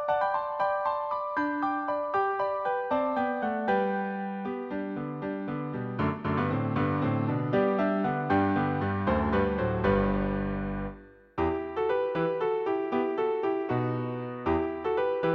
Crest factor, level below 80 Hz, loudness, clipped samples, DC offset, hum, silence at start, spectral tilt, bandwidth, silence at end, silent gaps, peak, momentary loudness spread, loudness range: 14 dB; -48 dBFS; -29 LUFS; under 0.1%; under 0.1%; none; 0 s; -9.5 dB/octave; 6 kHz; 0 s; none; -14 dBFS; 8 LU; 4 LU